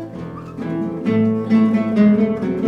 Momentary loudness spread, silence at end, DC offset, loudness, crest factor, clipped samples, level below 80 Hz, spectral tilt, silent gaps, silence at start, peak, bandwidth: 16 LU; 0 s; under 0.1%; -17 LUFS; 14 dB; under 0.1%; -52 dBFS; -9.5 dB/octave; none; 0 s; -4 dBFS; 5.8 kHz